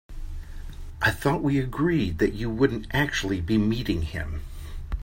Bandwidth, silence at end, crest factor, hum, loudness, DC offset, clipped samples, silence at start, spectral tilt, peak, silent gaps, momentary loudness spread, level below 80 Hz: 16.5 kHz; 0 s; 18 dB; none; -25 LUFS; under 0.1%; under 0.1%; 0.1 s; -6 dB/octave; -8 dBFS; none; 17 LU; -36 dBFS